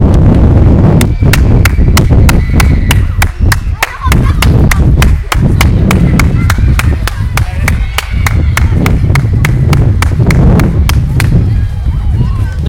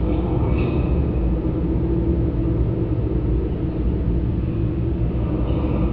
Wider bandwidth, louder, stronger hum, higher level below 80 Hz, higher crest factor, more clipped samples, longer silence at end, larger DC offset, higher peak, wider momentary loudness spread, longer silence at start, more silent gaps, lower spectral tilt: first, 17.5 kHz vs 4.5 kHz; first, -9 LUFS vs -22 LUFS; neither; first, -12 dBFS vs -24 dBFS; second, 6 dB vs 12 dB; first, 3% vs under 0.1%; about the same, 0 s vs 0 s; about the same, 0.8% vs 0.7%; first, 0 dBFS vs -8 dBFS; first, 6 LU vs 2 LU; about the same, 0 s vs 0 s; neither; second, -6 dB/octave vs -12.5 dB/octave